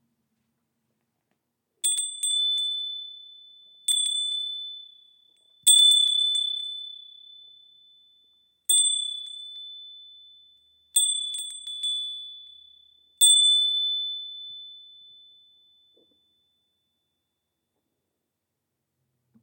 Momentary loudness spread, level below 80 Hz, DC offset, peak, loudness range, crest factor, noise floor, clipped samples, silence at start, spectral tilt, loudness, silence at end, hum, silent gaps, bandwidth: 24 LU; -90 dBFS; under 0.1%; -6 dBFS; 8 LU; 24 dB; -82 dBFS; under 0.1%; 1.85 s; 6.5 dB/octave; -21 LUFS; 4.6 s; none; none; 18 kHz